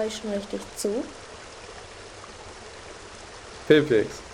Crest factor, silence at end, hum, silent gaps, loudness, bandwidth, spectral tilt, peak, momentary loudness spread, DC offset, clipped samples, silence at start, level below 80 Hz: 22 dB; 0 s; none; none; -25 LUFS; 14.5 kHz; -4.5 dB/octave; -6 dBFS; 21 LU; under 0.1%; under 0.1%; 0 s; -54 dBFS